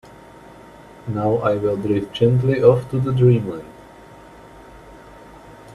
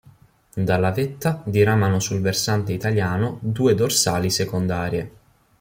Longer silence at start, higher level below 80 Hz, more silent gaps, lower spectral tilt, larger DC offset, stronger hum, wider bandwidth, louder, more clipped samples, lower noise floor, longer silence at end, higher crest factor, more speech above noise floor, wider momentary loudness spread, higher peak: about the same, 0.5 s vs 0.55 s; about the same, -50 dBFS vs -52 dBFS; neither; first, -9 dB/octave vs -5 dB/octave; neither; neither; second, 10.5 kHz vs 16.5 kHz; first, -18 LUFS vs -21 LUFS; neither; second, -43 dBFS vs -52 dBFS; second, 0 s vs 0.5 s; about the same, 20 dB vs 16 dB; second, 26 dB vs 32 dB; first, 15 LU vs 8 LU; first, 0 dBFS vs -6 dBFS